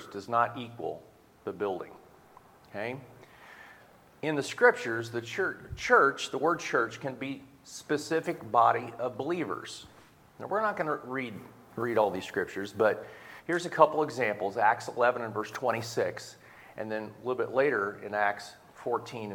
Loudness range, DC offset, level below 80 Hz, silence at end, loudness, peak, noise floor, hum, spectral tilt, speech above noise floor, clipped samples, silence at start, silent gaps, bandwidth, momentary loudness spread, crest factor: 7 LU; under 0.1%; -66 dBFS; 0 s; -30 LUFS; -6 dBFS; -57 dBFS; none; -4.5 dB/octave; 27 dB; under 0.1%; 0 s; none; 18.5 kHz; 19 LU; 26 dB